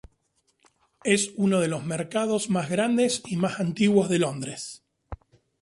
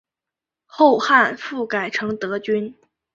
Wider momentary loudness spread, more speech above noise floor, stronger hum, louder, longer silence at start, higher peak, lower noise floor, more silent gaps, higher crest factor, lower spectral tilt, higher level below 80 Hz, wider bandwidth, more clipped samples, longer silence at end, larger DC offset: first, 16 LU vs 10 LU; second, 46 dB vs 68 dB; neither; second, -25 LUFS vs -19 LUFS; first, 1.05 s vs 0.75 s; second, -6 dBFS vs -2 dBFS; second, -71 dBFS vs -87 dBFS; neither; about the same, 20 dB vs 18 dB; about the same, -5 dB/octave vs -4.5 dB/octave; first, -56 dBFS vs -66 dBFS; first, 11.5 kHz vs 7.8 kHz; neither; about the same, 0.45 s vs 0.45 s; neither